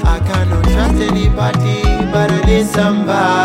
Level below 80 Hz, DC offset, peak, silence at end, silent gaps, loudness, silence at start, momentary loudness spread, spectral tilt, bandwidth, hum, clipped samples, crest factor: -18 dBFS; under 0.1%; -2 dBFS; 0 s; none; -14 LUFS; 0 s; 2 LU; -6.5 dB/octave; 15.5 kHz; none; under 0.1%; 12 dB